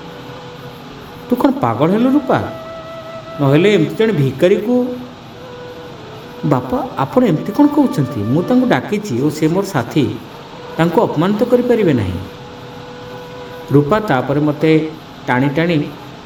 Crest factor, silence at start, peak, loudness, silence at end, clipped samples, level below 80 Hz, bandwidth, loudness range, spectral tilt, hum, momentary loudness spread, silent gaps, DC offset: 16 dB; 0 s; 0 dBFS; -15 LUFS; 0 s; under 0.1%; -48 dBFS; 19.5 kHz; 3 LU; -7.5 dB/octave; none; 19 LU; none; under 0.1%